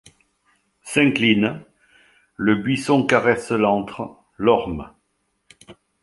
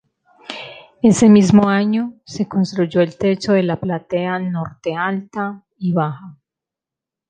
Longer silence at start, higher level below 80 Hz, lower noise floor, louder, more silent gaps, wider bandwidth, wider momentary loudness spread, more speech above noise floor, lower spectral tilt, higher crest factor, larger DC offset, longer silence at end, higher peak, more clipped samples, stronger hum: first, 0.85 s vs 0.5 s; about the same, -52 dBFS vs -52 dBFS; second, -71 dBFS vs -87 dBFS; about the same, -19 LUFS vs -17 LUFS; neither; first, 11.5 kHz vs 9.4 kHz; second, 16 LU vs 20 LU; second, 52 dB vs 70 dB; about the same, -5.5 dB/octave vs -6.5 dB/octave; about the same, 20 dB vs 16 dB; neither; second, 0.3 s vs 0.95 s; about the same, -2 dBFS vs -2 dBFS; neither; neither